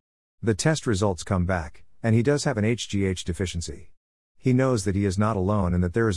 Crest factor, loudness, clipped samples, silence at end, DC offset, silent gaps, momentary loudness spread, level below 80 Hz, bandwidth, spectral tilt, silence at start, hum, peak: 16 dB; -25 LUFS; under 0.1%; 0 s; 0.4%; 3.97-4.35 s; 8 LU; -46 dBFS; 12 kHz; -6 dB/octave; 0.4 s; none; -8 dBFS